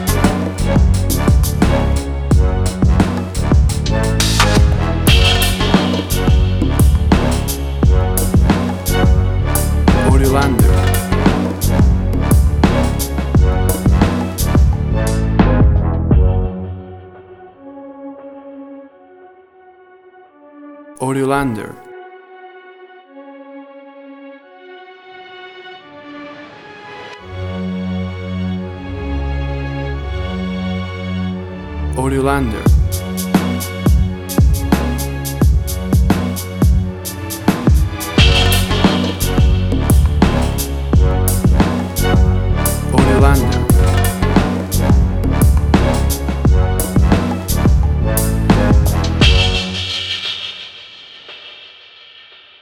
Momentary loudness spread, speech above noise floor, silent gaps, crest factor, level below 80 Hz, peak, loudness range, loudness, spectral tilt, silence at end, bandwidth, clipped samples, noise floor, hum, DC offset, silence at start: 20 LU; 29 dB; none; 14 dB; -18 dBFS; 0 dBFS; 11 LU; -15 LUFS; -5.5 dB/octave; 0.95 s; 17 kHz; under 0.1%; -44 dBFS; none; under 0.1%; 0 s